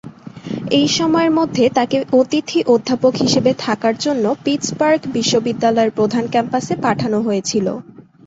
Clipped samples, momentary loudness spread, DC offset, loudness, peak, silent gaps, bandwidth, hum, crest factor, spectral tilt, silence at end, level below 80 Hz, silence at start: under 0.1%; 5 LU; under 0.1%; -16 LUFS; -2 dBFS; none; 8 kHz; none; 14 dB; -4.5 dB/octave; 0.25 s; -56 dBFS; 0.05 s